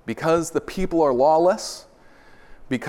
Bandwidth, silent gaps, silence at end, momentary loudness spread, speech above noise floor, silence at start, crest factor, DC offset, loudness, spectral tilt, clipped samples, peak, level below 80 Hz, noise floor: 16.5 kHz; none; 0 s; 13 LU; 29 dB; 0.05 s; 16 dB; under 0.1%; -21 LUFS; -5 dB/octave; under 0.1%; -6 dBFS; -44 dBFS; -49 dBFS